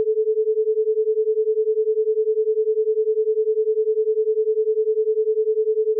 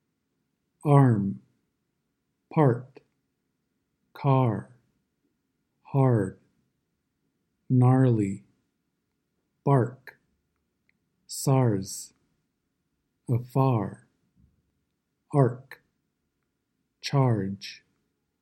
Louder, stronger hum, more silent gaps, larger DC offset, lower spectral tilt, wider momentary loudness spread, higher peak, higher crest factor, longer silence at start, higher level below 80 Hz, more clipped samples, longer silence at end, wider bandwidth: first, -21 LUFS vs -25 LUFS; neither; neither; neither; second, 0.5 dB/octave vs -7.5 dB/octave; second, 0 LU vs 17 LU; second, -14 dBFS vs -6 dBFS; second, 6 dB vs 24 dB; second, 0 s vs 0.85 s; second, under -90 dBFS vs -70 dBFS; neither; second, 0 s vs 0.65 s; second, 0.5 kHz vs 13.5 kHz